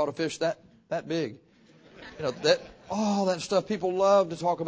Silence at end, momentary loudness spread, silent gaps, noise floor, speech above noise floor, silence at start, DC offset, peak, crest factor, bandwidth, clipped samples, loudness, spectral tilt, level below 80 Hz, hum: 0 s; 13 LU; none; -57 dBFS; 30 dB; 0 s; under 0.1%; -8 dBFS; 20 dB; 8 kHz; under 0.1%; -28 LUFS; -5 dB/octave; -64 dBFS; none